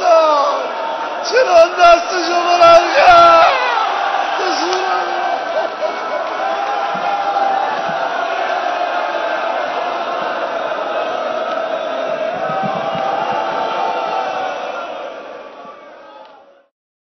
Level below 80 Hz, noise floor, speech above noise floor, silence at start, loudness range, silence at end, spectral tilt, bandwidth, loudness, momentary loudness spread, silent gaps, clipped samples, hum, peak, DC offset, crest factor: -52 dBFS; -44 dBFS; 33 dB; 0 s; 10 LU; 0.8 s; -3 dB/octave; 6.4 kHz; -15 LUFS; 13 LU; none; under 0.1%; none; 0 dBFS; under 0.1%; 16 dB